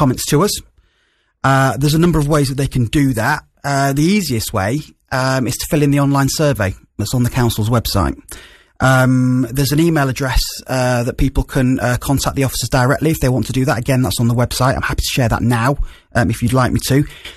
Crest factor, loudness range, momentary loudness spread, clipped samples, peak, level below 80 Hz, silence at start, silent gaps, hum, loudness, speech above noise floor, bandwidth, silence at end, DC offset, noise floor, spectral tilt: 14 dB; 1 LU; 6 LU; under 0.1%; -2 dBFS; -30 dBFS; 0 s; none; none; -16 LUFS; 46 dB; 14 kHz; 0 s; under 0.1%; -61 dBFS; -5.5 dB/octave